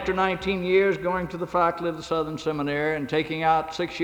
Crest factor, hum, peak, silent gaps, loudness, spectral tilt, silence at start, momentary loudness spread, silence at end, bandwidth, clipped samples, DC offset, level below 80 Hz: 16 dB; none; -8 dBFS; none; -25 LUFS; -6 dB/octave; 0 s; 7 LU; 0 s; 13 kHz; under 0.1%; under 0.1%; -50 dBFS